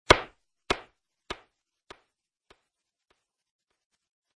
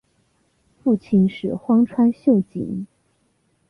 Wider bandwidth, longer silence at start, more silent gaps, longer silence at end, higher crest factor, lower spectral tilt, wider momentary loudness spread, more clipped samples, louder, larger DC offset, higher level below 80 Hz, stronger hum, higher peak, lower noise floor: first, 10.5 kHz vs 5 kHz; second, 0.1 s vs 0.85 s; neither; first, 3.05 s vs 0.85 s; first, 34 dB vs 14 dB; second, -3 dB/octave vs -10 dB/octave; first, 20 LU vs 12 LU; neither; second, -27 LUFS vs -20 LUFS; neither; first, -50 dBFS vs -56 dBFS; neither; first, 0 dBFS vs -6 dBFS; first, -83 dBFS vs -65 dBFS